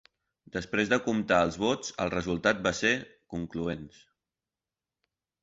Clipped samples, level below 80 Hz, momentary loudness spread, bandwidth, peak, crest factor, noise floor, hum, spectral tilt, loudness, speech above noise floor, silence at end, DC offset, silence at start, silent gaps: under 0.1%; -56 dBFS; 13 LU; 8 kHz; -10 dBFS; 20 dB; under -90 dBFS; none; -4.5 dB/octave; -29 LUFS; over 61 dB; 1.55 s; under 0.1%; 0.55 s; none